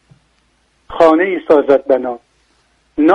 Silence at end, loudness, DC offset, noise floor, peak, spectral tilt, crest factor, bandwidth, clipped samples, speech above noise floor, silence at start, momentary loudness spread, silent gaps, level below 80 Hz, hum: 0 s; -13 LUFS; under 0.1%; -58 dBFS; 0 dBFS; -6.5 dB/octave; 14 dB; 8.2 kHz; under 0.1%; 46 dB; 0.9 s; 18 LU; none; -50 dBFS; none